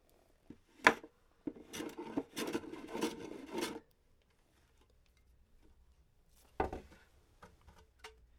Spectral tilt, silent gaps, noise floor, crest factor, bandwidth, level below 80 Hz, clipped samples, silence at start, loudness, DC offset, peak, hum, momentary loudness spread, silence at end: -3.5 dB/octave; none; -71 dBFS; 34 dB; 17.5 kHz; -64 dBFS; under 0.1%; 0.5 s; -39 LUFS; under 0.1%; -8 dBFS; none; 21 LU; 0.25 s